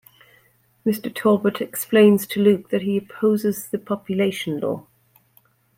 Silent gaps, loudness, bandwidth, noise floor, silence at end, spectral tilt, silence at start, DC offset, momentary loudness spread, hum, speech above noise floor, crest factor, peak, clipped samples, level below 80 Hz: none; -21 LUFS; 16.5 kHz; -60 dBFS; 1 s; -6 dB/octave; 0.85 s; under 0.1%; 11 LU; none; 40 dB; 18 dB; -4 dBFS; under 0.1%; -66 dBFS